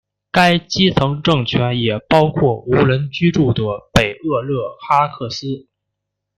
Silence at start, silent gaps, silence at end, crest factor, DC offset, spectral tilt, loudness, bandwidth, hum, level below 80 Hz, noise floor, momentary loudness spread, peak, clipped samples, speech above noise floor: 0.35 s; none; 0.75 s; 16 dB; under 0.1%; -6 dB/octave; -16 LUFS; 15 kHz; none; -40 dBFS; -78 dBFS; 9 LU; 0 dBFS; under 0.1%; 62 dB